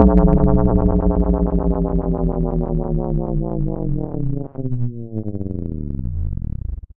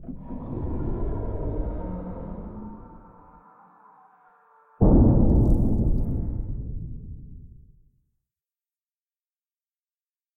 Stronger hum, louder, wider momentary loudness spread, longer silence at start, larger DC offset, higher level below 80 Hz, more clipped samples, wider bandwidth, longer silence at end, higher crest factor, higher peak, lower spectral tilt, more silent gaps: neither; first, -21 LUFS vs -25 LUFS; second, 12 LU vs 22 LU; about the same, 0 s vs 0 s; neither; first, -22 dBFS vs -30 dBFS; neither; first, 2.4 kHz vs 2.1 kHz; second, 0.2 s vs 2.9 s; about the same, 18 dB vs 18 dB; first, 0 dBFS vs -6 dBFS; about the same, -13.5 dB/octave vs -13 dB/octave; neither